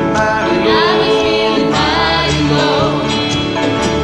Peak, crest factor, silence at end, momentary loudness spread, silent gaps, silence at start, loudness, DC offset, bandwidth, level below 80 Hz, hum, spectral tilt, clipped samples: 0 dBFS; 12 dB; 0 s; 4 LU; none; 0 s; -13 LUFS; under 0.1%; 11.5 kHz; -32 dBFS; none; -5 dB/octave; under 0.1%